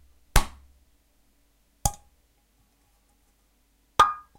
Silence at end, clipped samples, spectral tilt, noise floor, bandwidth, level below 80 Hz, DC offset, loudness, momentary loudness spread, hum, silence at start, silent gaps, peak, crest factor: 0.2 s; under 0.1%; -2.5 dB/octave; -66 dBFS; 16 kHz; -34 dBFS; under 0.1%; -26 LUFS; 16 LU; none; 0.35 s; none; -4 dBFS; 26 dB